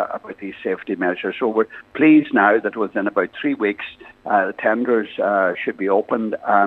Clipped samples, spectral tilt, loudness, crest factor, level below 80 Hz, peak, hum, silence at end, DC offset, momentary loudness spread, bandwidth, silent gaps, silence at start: under 0.1%; -8 dB/octave; -19 LUFS; 18 dB; -66 dBFS; 0 dBFS; none; 0 s; under 0.1%; 12 LU; 4.1 kHz; none; 0 s